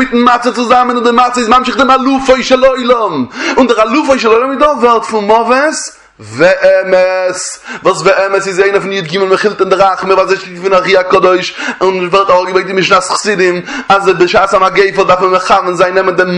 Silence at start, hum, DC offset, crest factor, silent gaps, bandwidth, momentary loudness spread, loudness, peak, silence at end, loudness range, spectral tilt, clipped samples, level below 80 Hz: 0 s; none; under 0.1%; 10 dB; none; 11 kHz; 6 LU; -9 LUFS; 0 dBFS; 0 s; 2 LU; -4 dB/octave; 0.6%; -44 dBFS